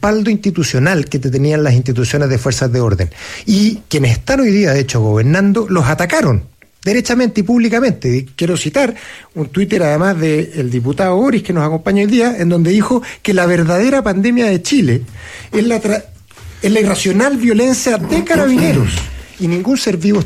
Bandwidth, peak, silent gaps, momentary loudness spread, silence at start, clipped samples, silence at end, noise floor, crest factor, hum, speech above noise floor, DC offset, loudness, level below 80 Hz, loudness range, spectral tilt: 15 kHz; -2 dBFS; none; 6 LU; 0 s; under 0.1%; 0 s; -34 dBFS; 12 dB; none; 22 dB; under 0.1%; -14 LUFS; -38 dBFS; 2 LU; -6 dB/octave